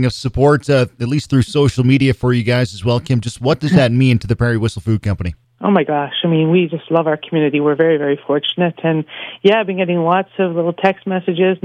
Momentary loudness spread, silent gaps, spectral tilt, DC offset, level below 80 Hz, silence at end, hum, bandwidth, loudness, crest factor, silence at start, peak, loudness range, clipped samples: 6 LU; none; -7 dB/octave; under 0.1%; -40 dBFS; 0.1 s; none; 10.5 kHz; -16 LUFS; 14 dB; 0 s; 0 dBFS; 2 LU; under 0.1%